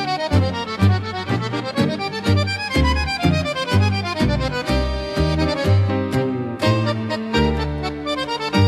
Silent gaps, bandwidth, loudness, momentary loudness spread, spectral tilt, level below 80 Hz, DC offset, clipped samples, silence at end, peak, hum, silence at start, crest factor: none; 12.5 kHz; -20 LUFS; 5 LU; -6.5 dB/octave; -30 dBFS; under 0.1%; under 0.1%; 0 s; -4 dBFS; none; 0 s; 16 dB